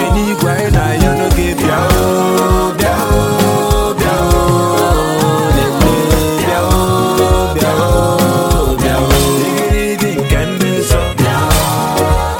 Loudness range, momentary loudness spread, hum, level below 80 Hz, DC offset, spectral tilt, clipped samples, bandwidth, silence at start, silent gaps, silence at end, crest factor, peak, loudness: 1 LU; 2 LU; none; -20 dBFS; under 0.1%; -5 dB/octave; under 0.1%; 17 kHz; 0 s; none; 0 s; 12 dB; 0 dBFS; -12 LUFS